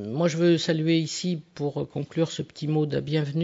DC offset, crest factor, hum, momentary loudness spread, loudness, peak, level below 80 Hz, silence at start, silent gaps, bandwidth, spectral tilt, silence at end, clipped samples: under 0.1%; 14 dB; none; 9 LU; -26 LUFS; -10 dBFS; -64 dBFS; 0 s; none; 8 kHz; -6 dB/octave; 0 s; under 0.1%